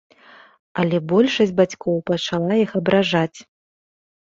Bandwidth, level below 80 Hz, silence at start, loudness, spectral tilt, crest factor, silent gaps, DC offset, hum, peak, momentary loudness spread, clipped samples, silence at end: 7.6 kHz; -58 dBFS; 0.75 s; -19 LUFS; -6 dB/octave; 18 dB; none; under 0.1%; none; -2 dBFS; 6 LU; under 0.1%; 0.95 s